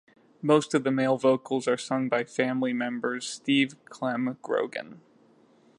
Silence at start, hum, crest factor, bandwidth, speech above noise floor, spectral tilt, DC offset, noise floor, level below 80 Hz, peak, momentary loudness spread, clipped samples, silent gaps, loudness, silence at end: 0.45 s; none; 20 dB; 11.5 kHz; 33 dB; -5 dB/octave; under 0.1%; -60 dBFS; -80 dBFS; -8 dBFS; 9 LU; under 0.1%; none; -27 LUFS; 0.8 s